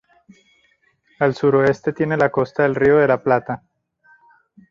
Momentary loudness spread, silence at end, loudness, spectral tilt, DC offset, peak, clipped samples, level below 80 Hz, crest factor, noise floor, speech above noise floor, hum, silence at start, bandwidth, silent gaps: 7 LU; 1.15 s; -18 LUFS; -8 dB/octave; under 0.1%; -2 dBFS; under 0.1%; -54 dBFS; 18 dB; -61 dBFS; 44 dB; none; 1.2 s; 7.4 kHz; none